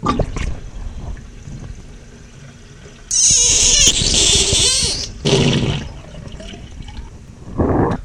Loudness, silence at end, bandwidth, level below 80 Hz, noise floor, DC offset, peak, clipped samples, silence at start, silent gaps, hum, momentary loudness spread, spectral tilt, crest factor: -13 LUFS; 0 s; 16 kHz; -30 dBFS; -38 dBFS; under 0.1%; 0 dBFS; under 0.1%; 0 s; none; none; 25 LU; -2 dB/octave; 18 dB